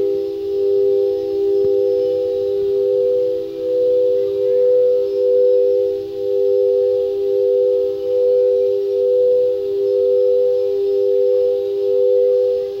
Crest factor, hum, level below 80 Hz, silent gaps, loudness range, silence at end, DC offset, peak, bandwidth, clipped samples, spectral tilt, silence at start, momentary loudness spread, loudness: 10 dB; none; -56 dBFS; none; 1 LU; 0 s; under 0.1%; -6 dBFS; 5.8 kHz; under 0.1%; -7.5 dB/octave; 0 s; 5 LU; -17 LUFS